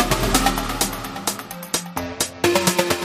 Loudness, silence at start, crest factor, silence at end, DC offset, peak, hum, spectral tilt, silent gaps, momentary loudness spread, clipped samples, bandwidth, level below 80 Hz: -21 LUFS; 0 s; 20 dB; 0 s; under 0.1%; -2 dBFS; none; -3 dB/octave; none; 8 LU; under 0.1%; 15.5 kHz; -34 dBFS